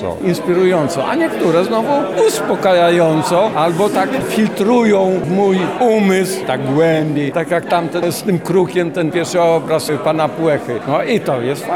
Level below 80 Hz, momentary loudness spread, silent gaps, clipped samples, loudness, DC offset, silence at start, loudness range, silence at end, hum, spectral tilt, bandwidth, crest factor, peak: -54 dBFS; 6 LU; none; under 0.1%; -15 LUFS; 0.2%; 0 s; 2 LU; 0 s; none; -5.5 dB/octave; 17.5 kHz; 12 dB; -4 dBFS